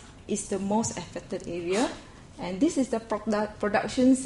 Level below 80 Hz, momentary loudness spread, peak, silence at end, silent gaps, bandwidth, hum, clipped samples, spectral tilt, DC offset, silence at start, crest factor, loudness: -54 dBFS; 11 LU; -10 dBFS; 0 s; none; 11.5 kHz; none; under 0.1%; -4.5 dB/octave; under 0.1%; 0 s; 18 dB; -29 LUFS